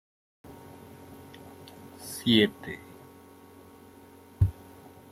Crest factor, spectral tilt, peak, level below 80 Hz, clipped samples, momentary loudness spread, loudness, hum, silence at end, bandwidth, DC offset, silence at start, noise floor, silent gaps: 26 dB; -5.5 dB/octave; -8 dBFS; -52 dBFS; under 0.1%; 29 LU; -27 LUFS; none; 0.6 s; 16 kHz; under 0.1%; 0.5 s; -52 dBFS; none